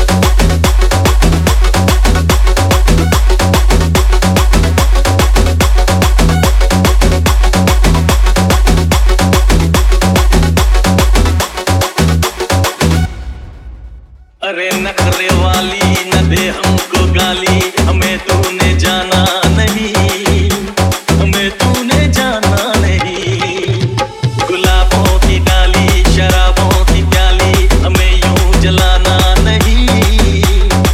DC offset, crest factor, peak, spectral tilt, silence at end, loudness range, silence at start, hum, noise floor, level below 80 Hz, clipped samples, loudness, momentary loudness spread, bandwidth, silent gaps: under 0.1%; 10 dB; 0 dBFS; -4.5 dB/octave; 0 s; 3 LU; 0 s; none; -35 dBFS; -12 dBFS; under 0.1%; -11 LUFS; 4 LU; 16 kHz; none